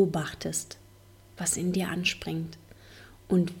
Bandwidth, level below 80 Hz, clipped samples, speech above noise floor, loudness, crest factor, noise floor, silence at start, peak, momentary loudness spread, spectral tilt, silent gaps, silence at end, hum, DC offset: 17 kHz; -56 dBFS; under 0.1%; 26 dB; -30 LUFS; 18 dB; -54 dBFS; 0 s; -12 dBFS; 23 LU; -4.5 dB/octave; none; 0 s; none; under 0.1%